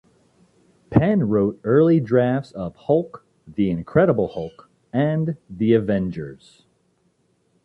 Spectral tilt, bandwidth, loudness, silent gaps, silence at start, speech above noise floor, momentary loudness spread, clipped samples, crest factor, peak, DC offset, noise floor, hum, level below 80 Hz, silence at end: -10 dB/octave; 8.2 kHz; -20 LUFS; none; 0.9 s; 45 dB; 15 LU; under 0.1%; 18 dB; -4 dBFS; under 0.1%; -65 dBFS; none; -50 dBFS; 1.3 s